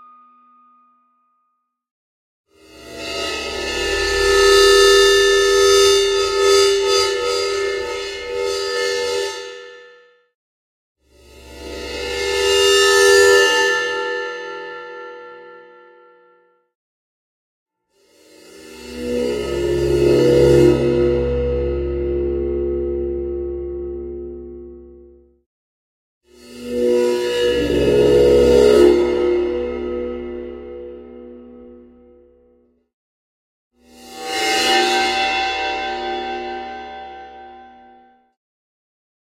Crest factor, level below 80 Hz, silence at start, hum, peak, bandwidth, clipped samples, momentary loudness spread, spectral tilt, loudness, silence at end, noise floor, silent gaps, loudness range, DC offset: 18 dB; -36 dBFS; 2.75 s; none; 0 dBFS; 16 kHz; under 0.1%; 22 LU; -3.5 dB/octave; -16 LUFS; 1.55 s; -70 dBFS; 10.35-10.95 s, 16.75-17.66 s, 25.46-26.21 s, 32.94-33.71 s; 17 LU; under 0.1%